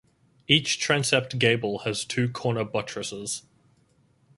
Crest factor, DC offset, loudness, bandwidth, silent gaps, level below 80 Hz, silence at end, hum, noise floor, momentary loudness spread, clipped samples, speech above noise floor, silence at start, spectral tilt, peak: 24 dB; under 0.1%; -25 LUFS; 11.5 kHz; none; -62 dBFS; 1 s; none; -64 dBFS; 11 LU; under 0.1%; 38 dB; 0.5 s; -3.5 dB/octave; -4 dBFS